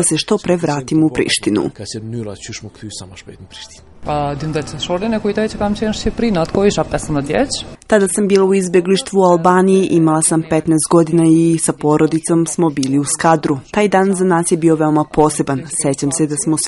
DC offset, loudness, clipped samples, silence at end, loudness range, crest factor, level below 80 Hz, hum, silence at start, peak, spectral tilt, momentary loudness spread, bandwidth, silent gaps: under 0.1%; -15 LUFS; under 0.1%; 0 s; 9 LU; 14 dB; -40 dBFS; none; 0 s; 0 dBFS; -5 dB/octave; 14 LU; 11.5 kHz; none